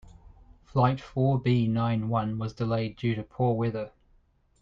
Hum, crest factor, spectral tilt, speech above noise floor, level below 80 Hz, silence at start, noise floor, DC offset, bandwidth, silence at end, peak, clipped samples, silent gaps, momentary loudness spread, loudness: none; 18 dB; -9 dB/octave; 37 dB; -54 dBFS; 0.05 s; -64 dBFS; under 0.1%; 6.8 kHz; 0.75 s; -10 dBFS; under 0.1%; none; 7 LU; -28 LUFS